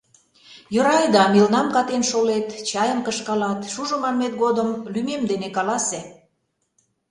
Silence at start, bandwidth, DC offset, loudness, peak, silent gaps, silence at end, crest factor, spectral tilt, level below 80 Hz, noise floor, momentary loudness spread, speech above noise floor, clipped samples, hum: 0.5 s; 11.5 kHz; under 0.1%; -21 LUFS; -2 dBFS; none; 1 s; 20 dB; -4 dB/octave; -62 dBFS; -72 dBFS; 10 LU; 52 dB; under 0.1%; none